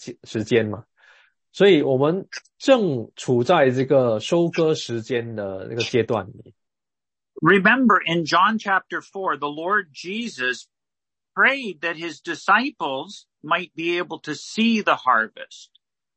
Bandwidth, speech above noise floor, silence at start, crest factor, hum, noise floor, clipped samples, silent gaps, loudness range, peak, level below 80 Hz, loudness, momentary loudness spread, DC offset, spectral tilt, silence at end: 8.6 kHz; over 69 dB; 0 s; 18 dB; none; under -90 dBFS; under 0.1%; none; 4 LU; -4 dBFS; -68 dBFS; -21 LUFS; 14 LU; under 0.1%; -5.5 dB/octave; 0.5 s